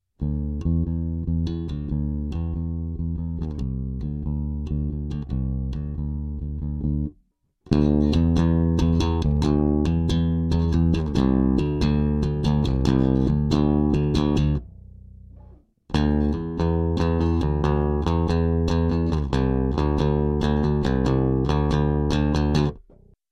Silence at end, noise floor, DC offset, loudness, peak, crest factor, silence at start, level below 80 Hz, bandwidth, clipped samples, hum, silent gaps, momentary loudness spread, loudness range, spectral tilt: 0.55 s; -64 dBFS; under 0.1%; -23 LUFS; -4 dBFS; 18 dB; 0.2 s; -28 dBFS; 8.2 kHz; under 0.1%; none; none; 9 LU; 7 LU; -8.5 dB/octave